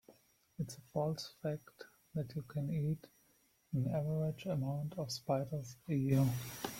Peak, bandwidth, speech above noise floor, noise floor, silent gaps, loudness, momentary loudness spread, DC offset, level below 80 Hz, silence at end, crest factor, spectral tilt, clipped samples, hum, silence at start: -20 dBFS; 16.5 kHz; 35 dB; -73 dBFS; none; -39 LUFS; 11 LU; under 0.1%; -68 dBFS; 0 s; 18 dB; -7 dB/octave; under 0.1%; none; 0.1 s